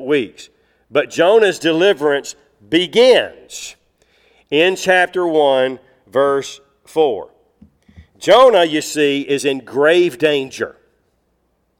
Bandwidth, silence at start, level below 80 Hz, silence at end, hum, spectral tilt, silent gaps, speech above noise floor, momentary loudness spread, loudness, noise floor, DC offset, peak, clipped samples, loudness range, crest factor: 15.5 kHz; 0 s; -58 dBFS; 1.1 s; none; -3.5 dB/octave; none; 50 dB; 16 LU; -15 LUFS; -64 dBFS; under 0.1%; -2 dBFS; under 0.1%; 3 LU; 16 dB